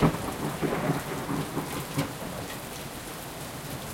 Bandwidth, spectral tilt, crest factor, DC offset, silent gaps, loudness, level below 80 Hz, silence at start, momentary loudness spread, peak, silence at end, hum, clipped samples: 17 kHz; -5 dB/octave; 22 dB; under 0.1%; none; -32 LUFS; -48 dBFS; 0 s; 8 LU; -10 dBFS; 0 s; none; under 0.1%